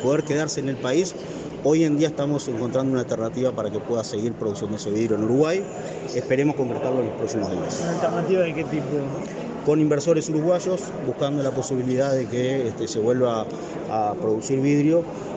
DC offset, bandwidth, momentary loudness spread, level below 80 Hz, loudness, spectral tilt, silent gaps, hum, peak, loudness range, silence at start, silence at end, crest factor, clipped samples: under 0.1%; 8.8 kHz; 8 LU; -58 dBFS; -24 LUFS; -6 dB/octave; none; none; -8 dBFS; 2 LU; 0 s; 0 s; 16 dB; under 0.1%